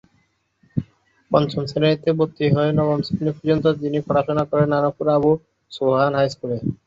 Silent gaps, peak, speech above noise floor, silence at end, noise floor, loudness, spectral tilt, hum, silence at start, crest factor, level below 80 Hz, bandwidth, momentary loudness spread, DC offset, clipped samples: none; -2 dBFS; 45 dB; 0.1 s; -65 dBFS; -20 LUFS; -8 dB/octave; none; 0.75 s; 18 dB; -52 dBFS; 7.8 kHz; 7 LU; under 0.1%; under 0.1%